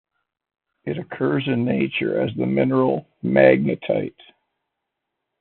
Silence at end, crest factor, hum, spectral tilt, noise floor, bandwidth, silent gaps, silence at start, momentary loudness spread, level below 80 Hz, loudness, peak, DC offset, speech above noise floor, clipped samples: 1.3 s; 20 dB; none; -6 dB/octave; -81 dBFS; 4.3 kHz; none; 0.85 s; 14 LU; -60 dBFS; -21 LUFS; -2 dBFS; under 0.1%; 60 dB; under 0.1%